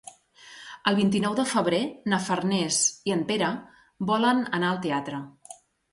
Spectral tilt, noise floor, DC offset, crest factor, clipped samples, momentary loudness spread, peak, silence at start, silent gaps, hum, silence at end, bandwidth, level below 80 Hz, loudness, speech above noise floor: -4 dB/octave; -50 dBFS; under 0.1%; 16 dB; under 0.1%; 15 LU; -10 dBFS; 0.05 s; none; none; 0.4 s; 11.5 kHz; -66 dBFS; -25 LUFS; 25 dB